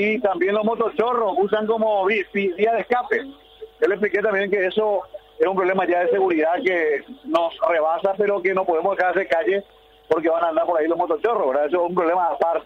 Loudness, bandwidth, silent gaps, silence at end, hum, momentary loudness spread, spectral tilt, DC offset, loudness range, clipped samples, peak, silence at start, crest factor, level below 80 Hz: -21 LUFS; 6.8 kHz; none; 0 s; none; 4 LU; -7 dB/octave; under 0.1%; 1 LU; under 0.1%; -6 dBFS; 0 s; 14 dB; -60 dBFS